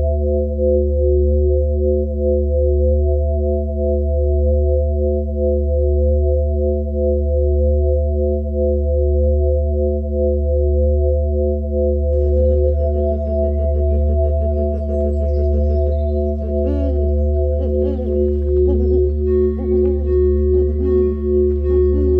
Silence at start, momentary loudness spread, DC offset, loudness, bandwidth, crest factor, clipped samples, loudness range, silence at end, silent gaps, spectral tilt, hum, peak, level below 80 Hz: 0 s; 3 LU; under 0.1%; -18 LUFS; 1.9 kHz; 10 dB; under 0.1%; 2 LU; 0 s; none; -13 dB/octave; none; -6 dBFS; -18 dBFS